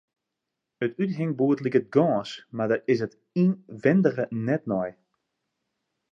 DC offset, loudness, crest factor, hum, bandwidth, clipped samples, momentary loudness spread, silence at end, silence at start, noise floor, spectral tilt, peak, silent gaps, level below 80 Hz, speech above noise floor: under 0.1%; -25 LUFS; 20 dB; none; 7.6 kHz; under 0.1%; 9 LU; 1.2 s; 0.8 s; -84 dBFS; -8.5 dB/octave; -6 dBFS; none; -70 dBFS; 60 dB